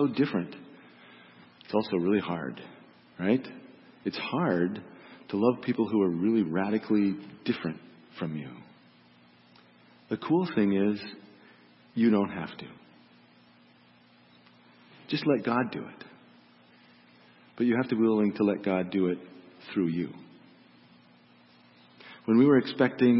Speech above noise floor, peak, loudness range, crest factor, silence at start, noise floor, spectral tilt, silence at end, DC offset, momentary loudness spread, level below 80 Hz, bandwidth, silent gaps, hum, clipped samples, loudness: 32 dB; -10 dBFS; 6 LU; 20 dB; 0 s; -59 dBFS; -10.5 dB/octave; 0 s; under 0.1%; 20 LU; -72 dBFS; 5.8 kHz; none; 60 Hz at -55 dBFS; under 0.1%; -28 LUFS